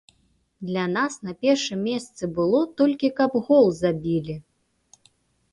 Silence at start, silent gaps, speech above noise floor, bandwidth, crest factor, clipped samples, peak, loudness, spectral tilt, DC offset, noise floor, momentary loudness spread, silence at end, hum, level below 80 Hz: 0.6 s; none; 43 dB; 11.5 kHz; 18 dB; under 0.1%; -6 dBFS; -23 LUFS; -5.5 dB/octave; under 0.1%; -66 dBFS; 12 LU; 1.15 s; none; -60 dBFS